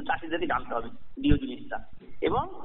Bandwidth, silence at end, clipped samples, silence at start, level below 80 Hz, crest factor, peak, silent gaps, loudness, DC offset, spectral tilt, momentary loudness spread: 4 kHz; 0 s; under 0.1%; 0 s; -38 dBFS; 20 dB; -8 dBFS; none; -30 LUFS; 1%; -5 dB/octave; 12 LU